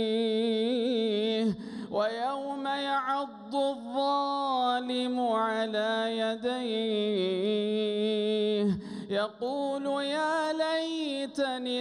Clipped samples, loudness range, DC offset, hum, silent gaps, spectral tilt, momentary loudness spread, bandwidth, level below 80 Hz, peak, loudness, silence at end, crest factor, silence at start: under 0.1%; 1 LU; under 0.1%; none; none; -5 dB/octave; 5 LU; 11 kHz; -72 dBFS; -16 dBFS; -30 LUFS; 0 s; 12 dB; 0 s